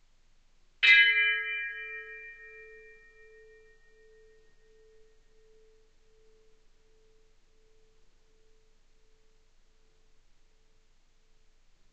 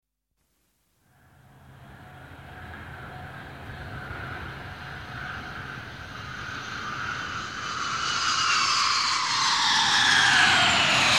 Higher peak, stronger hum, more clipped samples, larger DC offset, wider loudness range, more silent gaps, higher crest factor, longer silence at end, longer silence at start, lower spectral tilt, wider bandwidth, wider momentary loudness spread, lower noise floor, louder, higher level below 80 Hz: about the same, -8 dBFS vs -8 dBFS; neither; neither; neither; about the same, 25 LU vs 23 LU; neither; first, 26 dB vs 20 dB; first, 9.3 s vs 0 s; second, 0.8 s vs 1.65 s; second, 1.5 dB/octave vs -1 dB/octave; second, 8.2 kHz vs 16.5 kHz; first, 29 LU vs 22 LU; second, -63 dBFS vs -75 dBFS; about the same, -23 LUFS vs -22 LUFS; second, -64 dBFS vs -52 dBFS